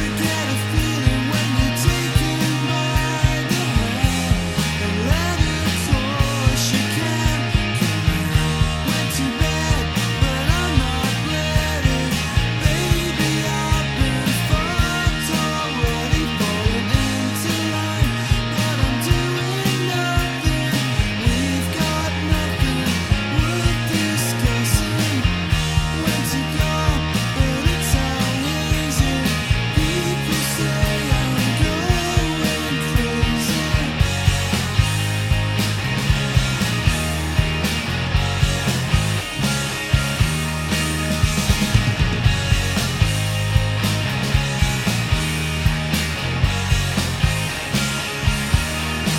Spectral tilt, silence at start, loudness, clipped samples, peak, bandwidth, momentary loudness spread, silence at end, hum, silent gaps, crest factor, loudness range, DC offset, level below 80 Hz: -4.5 dB/octave; 0 s; -20 LUFS; under 0.1%; -2 dBFS; 17 kHz; 2 LU; 0 s; none; none; 18 dB; 1 LU; under 0.1%; -26 dBFS